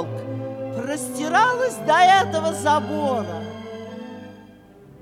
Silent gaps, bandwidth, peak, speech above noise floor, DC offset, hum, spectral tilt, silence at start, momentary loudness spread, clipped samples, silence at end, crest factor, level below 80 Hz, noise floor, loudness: none; 15.5 kHz; -4 dBFS; 27 dB; under 0.1%; none; -4 dB/octave; 0 s; 20 LU; under 0.1%; 0.05 s; 18 dB; -64 dBFS; -47 dBFS; -20 LUFS